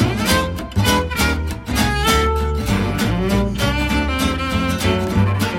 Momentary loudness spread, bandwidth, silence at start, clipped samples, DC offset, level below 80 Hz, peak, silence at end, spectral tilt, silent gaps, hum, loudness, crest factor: 4 LU; 16.5 kHz; 0 s; under 0.1%; under 0.1%; -26 dBFS; -2 dBFS; 0 s; -5 dB/octave; none; none; -18 LUFS; 16 dB